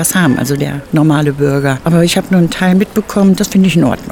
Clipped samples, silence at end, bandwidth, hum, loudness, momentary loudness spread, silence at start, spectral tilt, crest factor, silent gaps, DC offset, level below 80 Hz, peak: under 0.1%; 0 s; 18.5 kHz; none; -11 LUFS; 4 LU; 0 s; -5.5 dB/octave; 10 dB; none; under 0.1%; -38 dBFS; 0 dBFS